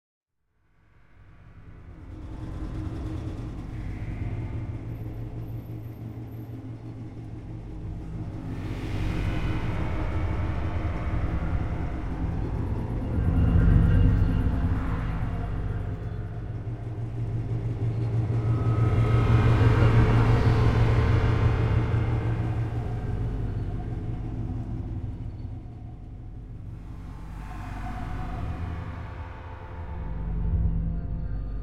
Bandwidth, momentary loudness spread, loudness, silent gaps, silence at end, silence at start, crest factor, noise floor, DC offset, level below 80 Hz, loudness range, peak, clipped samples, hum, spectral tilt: 6.8 kHz; 18 LU; -28 LUFS; none; 0 s; 1.3 s; 20 dB; -70 dBFS; under 0.1%; -32 dBFS; 15 LU; -8 dBFS; under 0.1%; none; -8.5 dB/octave